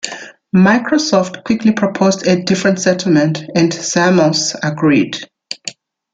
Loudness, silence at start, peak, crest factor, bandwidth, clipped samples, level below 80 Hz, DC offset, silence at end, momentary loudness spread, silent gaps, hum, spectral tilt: -14 LUFS; 0.05 s; 0 dBFS; 14 dB; 9.2 kHz; under 0.1%; -54 dBFS; under 0.1%; 0.4 s; 15 LU; none; none; -5 dB/octave